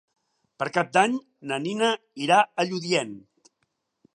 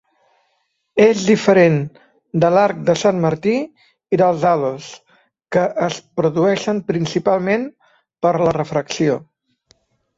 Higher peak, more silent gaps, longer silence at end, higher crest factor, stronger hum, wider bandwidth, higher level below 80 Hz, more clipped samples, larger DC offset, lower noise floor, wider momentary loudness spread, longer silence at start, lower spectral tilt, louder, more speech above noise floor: about the same, -4 dBFS vs -2 dBFS; neither; about the same, 0.95 s vs 0.95 s; first, 22 dB vs 16 dB; neither; first, 11.5 kHz vs 8 kHz; second, -78 dBFS vs -56 dBFS; neither; neither; first, -76 dBFS vs -68 dBFS; about the same, 12 LU vs 10 LU; second, 0.6 s vs 0.95 s; second, -4 dB/octave vs -6 dB/octave; second, -24 LUFS vs -17 LUFS; about the same, 52 dB vs 52 dB